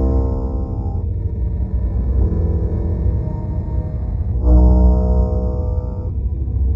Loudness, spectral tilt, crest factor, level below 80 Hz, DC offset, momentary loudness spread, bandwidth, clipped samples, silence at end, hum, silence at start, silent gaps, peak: -19 LUFS; -12.5 dB/octave; 14 dB; -18 dBFS; under 0.1%; 9 LU; 1.9 kHz; under 0.1%; 0 s; none; 0 s; none; -2 dBFS